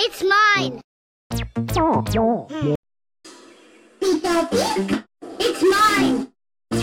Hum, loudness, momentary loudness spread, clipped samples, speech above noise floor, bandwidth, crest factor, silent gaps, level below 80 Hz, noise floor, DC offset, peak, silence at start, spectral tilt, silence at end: none; -20 LUFS; 13 LU; under 0.1%; 30 dB; 17.5 kHz; 14 dB; 0.84-1.30 s, 2.76-2.83 s; -42 dBFS; -50 dBFS; under 0.1%; -6 dBFS; 0 s; -4.5 dB/octave; 0 s